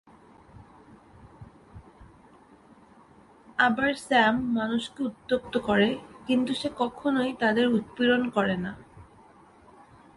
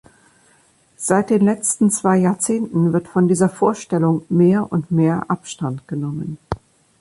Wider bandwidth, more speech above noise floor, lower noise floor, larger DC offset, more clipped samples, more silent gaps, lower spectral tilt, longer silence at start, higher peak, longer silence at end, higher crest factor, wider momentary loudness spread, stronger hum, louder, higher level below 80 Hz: about the same, 11.5 kHz vs 11.5 kHz; second, 29 dB vs 39 dB; about the same, -55 dBFS vs -56 dBFS; neither; neither; neither; about the same, -5.5 dB/octave vs -6.5 dB/octave; first, 1.25 s vs 1 s; second, -8 dBFS vs -2 dBFS; first, 1.15 s vs 0.45 s; about the same, 20 dB vs 16 dB; about the same, 10 LU vs 11 LU; neither; second, -26 LUFS vs -18 LUFS; second, -60 dBFS vs -50 dBFS